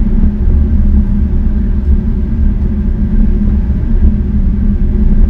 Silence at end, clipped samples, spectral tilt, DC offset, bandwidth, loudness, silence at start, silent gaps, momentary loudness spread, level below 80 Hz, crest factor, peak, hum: 0 s; 0.4%; -11.5 dB/octave; under 0.1%; 2.4 kHz; -14 LUFS; 0 s; none; 3 LU; -10 dBFS; 10 dB; 0 dBFS; none